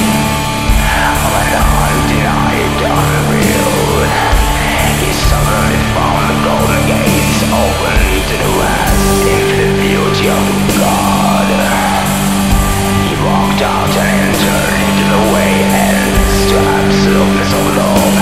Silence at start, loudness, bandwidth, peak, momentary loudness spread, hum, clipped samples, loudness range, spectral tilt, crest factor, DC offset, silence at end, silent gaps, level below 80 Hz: 0 s; -11 LUFS; 16.5 kHz; 0 dBFS; 2 LU; none; under 0.1%; 1 LU; -4.5 dB/octave; 10 dB; 2%; 0 s; none; -20 dBFS